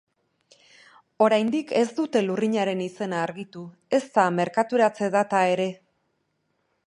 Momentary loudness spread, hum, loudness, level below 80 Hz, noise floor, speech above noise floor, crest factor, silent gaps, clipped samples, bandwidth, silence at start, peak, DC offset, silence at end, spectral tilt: 8 LU; none; -24 LUFS; -76 dBFS; -73 dBFS; 50 dB; 20 dB; none; under 0.1%; 11 kHz; 1.2 s; -6 dBFS; under 0.1%; 1.1 s; -5.5 dB/octave